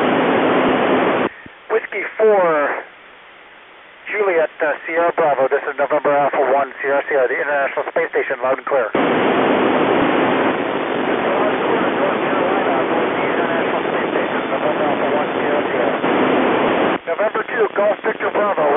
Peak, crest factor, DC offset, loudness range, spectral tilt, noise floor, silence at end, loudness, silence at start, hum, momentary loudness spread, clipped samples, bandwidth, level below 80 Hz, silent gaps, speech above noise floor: -4 dBFS; 14 dB; under 0.1%; 3 LU; -10 dB/octave; -42 dBFS; 0 s; -17 LUFS; 0 s; none; 5 LU; under 0.1%; 3.9 kHz; -58 dBFS; none; 25 dB